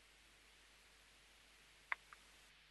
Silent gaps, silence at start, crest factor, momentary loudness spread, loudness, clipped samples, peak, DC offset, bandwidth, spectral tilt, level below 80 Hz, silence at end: none; 0 s; 38 dB; 17 LU; -55 LUFS; under 0.1%; -20 dBFS; under 0.1%; 12 kHz; -0.5 dB/octave; -78 dBFS; 0 s